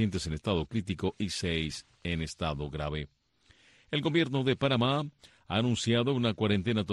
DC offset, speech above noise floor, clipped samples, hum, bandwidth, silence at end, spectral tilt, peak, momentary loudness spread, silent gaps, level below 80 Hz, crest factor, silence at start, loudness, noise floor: under 0.1%; 34 dB; under 0.1%; none; 12 kHz; 0 s; -5.5 dB/octave; -14 dBFS; 8 LU; none; -50 dBFS; 16 dB; 0 s; -31 LUFS; -64 dBFS